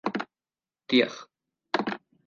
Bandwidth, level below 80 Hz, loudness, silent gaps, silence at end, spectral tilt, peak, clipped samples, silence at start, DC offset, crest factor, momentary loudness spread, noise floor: 7.2 kHz; -78 dBFS; -28 LUFS; none; 0.3 s; -4.5 dB/octave; -8 dBFS; under 0.1%; 0.05 s; under 0.1%; 22 dB; 16 LU; under -90 dBFS